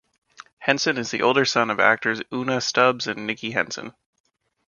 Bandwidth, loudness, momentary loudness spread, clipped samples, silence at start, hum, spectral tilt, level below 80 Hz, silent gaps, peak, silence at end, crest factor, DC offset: 7.4 kHz; -22 LUFS; 9 LU; under 0.1%; 0.4 s; none; -3.5 dB/octave; -66 dBFS; 0.53-0.57 s; 0 dBFS; 0.8 s; 22 dB; under 0.1%